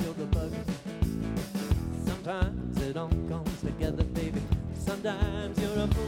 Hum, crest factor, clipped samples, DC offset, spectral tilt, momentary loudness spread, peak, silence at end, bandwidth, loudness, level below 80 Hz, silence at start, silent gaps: none; 16 dB; under 0.1%; under 0.1%; -7 dB/octave; 3 LU; -14 dBFS; 0 s; 16.5 kHz; -32 LUFS; -36 dBFS; 0 s; none